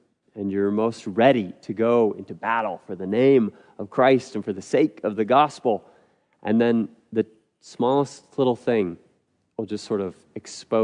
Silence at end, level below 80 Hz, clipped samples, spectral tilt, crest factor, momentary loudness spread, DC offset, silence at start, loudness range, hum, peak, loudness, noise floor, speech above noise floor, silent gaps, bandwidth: 0 s; -74 dBFS; under 0.1%; -6.5 dB/octave; 20 dB; 13 LU; under 0.1%; 0.35 s; 5 LU; none; -4 dBFS; -23 LUFS; -67 dBFS; 45 dB; none; 10.5 kHz